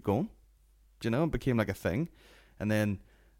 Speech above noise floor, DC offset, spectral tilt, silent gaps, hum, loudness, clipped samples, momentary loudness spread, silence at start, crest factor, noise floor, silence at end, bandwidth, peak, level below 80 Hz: 32 dB; under 0.1%; -7 dB/octave; none; none; -32 LUFS; under 0.1%; 10 LU; 0.05 s; 20 dB; -63 dBFS; 0.4 s; 16.5 kHz; -12 dBFS; -50 dBFS